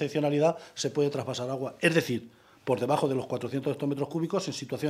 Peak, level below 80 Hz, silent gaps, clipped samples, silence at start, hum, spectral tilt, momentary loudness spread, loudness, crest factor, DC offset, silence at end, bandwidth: -8 dBFS; -72 dBFS; none; under 0.1%; 0 s; none; -5.5 dB/octave; 8 LU; -29 LUFS; 20 dB; under 0.1%; 0 s; 15 kHz